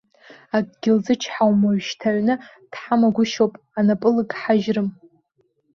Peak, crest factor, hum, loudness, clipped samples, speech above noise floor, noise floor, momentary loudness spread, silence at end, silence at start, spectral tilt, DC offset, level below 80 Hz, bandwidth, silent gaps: -4 dBFS; 16 dB; none; -20 LUFS; under 0.1%; 47 dB; -66 dBFS; 7 LU; 0.85 s; 0.3 s; -6 dB/octave; under 0.1%; -64 dBFS; 7 kHz; none